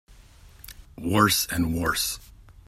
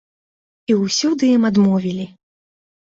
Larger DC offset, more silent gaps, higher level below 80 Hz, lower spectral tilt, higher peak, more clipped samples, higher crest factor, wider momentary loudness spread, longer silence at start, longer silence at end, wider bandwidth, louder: neither; neither; first, -46 dBFS vs -60 dBFS; second, -3.5 dB/octave vs -5.5 dB/octave; about the same, -4 dBFS vs -6 dBFS; neither; first, 22 dB vs 14 dB; first, 24 LU vs 15 LU; second, 0.2 s vs 0.7 s; second, 0.25 s vs 0.85 s; first, 16 kHz vs 7.8 kHz; second, -24 LUFS vs -17 LUFS